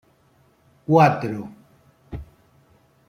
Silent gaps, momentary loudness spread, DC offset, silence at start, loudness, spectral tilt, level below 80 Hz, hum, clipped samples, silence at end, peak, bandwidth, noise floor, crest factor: none; 23 LU; under 0.1%; 0.9 s; -19 LUFS; -8 dB/octave; -50 dBFS; none; under 0.1%; 0.85 s; -2 dBFS; 15 kHz; -59 dBFS; 22 dB